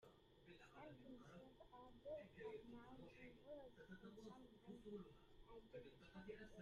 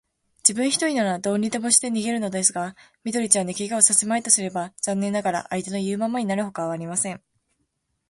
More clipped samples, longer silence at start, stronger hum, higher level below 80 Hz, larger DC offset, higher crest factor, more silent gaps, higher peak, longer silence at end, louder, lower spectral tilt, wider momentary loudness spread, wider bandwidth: neither; second, 0 s vs 0.45 s; neither; second, -76 dBFS vs -66 dBFS; neither; second, 16 dB vs 24 dB; neither; second, -46 dBFS vs 0 dBFS; second, 0 s vs 0.9 s; second, -61 LUFS vs -22 LUFS; first, -6.5 dB/octave vs -3 dB/octave; about the same, 9 LU vs 11 LU; second, 10.5 kHz vs 12 kHz